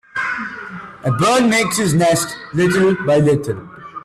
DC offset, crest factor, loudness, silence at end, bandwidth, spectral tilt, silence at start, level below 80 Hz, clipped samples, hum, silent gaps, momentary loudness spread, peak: under 0.1%; 12 dB; -16 LUFS; 0.05 s; 15 kHz; -5 dB/octave; 0.15 s; -50 dBFS; under 0.1%; none; none; 14 LU; -4 dBFS